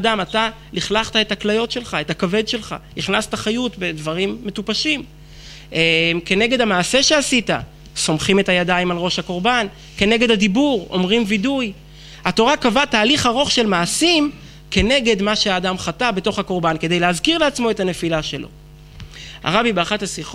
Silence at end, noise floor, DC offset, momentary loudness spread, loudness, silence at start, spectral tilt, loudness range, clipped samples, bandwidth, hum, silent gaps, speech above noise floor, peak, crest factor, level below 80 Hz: 0 s; -39 dBFS; under 0.1%; 10 LU; -18 LUFS; 0 s; -3.5 dB/octave; 5 LU; under 0.1%; 15.5 kHz; none; none; 21 dB; -2 dBFS; 16 dB; -40 dBFS